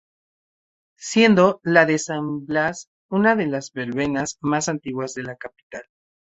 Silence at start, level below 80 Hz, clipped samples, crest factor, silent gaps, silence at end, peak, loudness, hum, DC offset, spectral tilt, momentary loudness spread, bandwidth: 1 s; -60 dBFS; under 0.1%; 20 dB; 2.87-3.09 s, 5.63-5.70 s; 0.5 s; -2 dBFS; -20 LUFS; none; under 0.1%; -5 dB/octave; 20 LU; 8.2 kHz